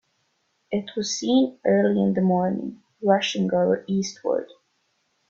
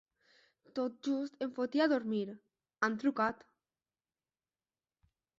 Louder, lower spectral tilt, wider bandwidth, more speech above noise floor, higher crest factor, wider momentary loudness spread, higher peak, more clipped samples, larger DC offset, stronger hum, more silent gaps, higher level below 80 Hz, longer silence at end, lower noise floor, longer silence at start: first, -23 LUFS vs -35 LUFS; first, -5.5 dB/octave vs -3.5 dB/octave; about the same, 7.6 kHz vs 7.6 kHz; second, 49 dB vs over 56 dB; about the same, 18 dB vs 20 dB; second, 9 LU vs 13 LU; first, -6 dBFS vs -18 dBFS; neither; neither; neither; neither; first, -66 dBFS vs -80 dBFS; second, 0.85 s vs 2.05 s; second, -71 dBFS vs under -90 dBFS; about the same, 0.7 s vs 0.75 s